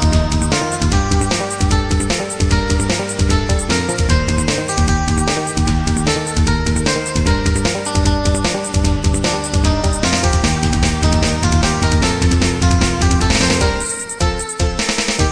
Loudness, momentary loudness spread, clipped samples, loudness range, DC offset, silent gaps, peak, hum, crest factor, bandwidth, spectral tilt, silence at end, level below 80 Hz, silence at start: -16 LUFS; 3 LU; under 0.1%; 2 LU; under 0.1%; none; 0 dBFS; none; 14 dB; 10.5 kHz; -4.5 dB/octave; 0 s; -20 dBFS; 0 s